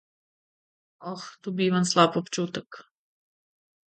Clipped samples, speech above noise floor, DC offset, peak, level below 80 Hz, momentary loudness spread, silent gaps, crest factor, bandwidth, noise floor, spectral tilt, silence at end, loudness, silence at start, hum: under 0.1%; over 64 dB; under 0.1%; -4 dBFS; -74 dBFS; 17 LU; none; 24 dB; 9.2 kHz; under -90 dBFS; -4.5 dB/octave; 1.05 s; -25 LUFS; 1 s; none